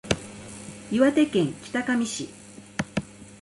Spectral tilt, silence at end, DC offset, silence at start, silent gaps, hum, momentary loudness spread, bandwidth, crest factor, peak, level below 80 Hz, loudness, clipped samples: -5 dB/octave; 0.1 s; under 0.1%; 0.05 s; none; none; 19 LU; 11.5 kHz; 18 dB; -8 dBFS; -52 dBFS; -26 LUFS; under 0.1%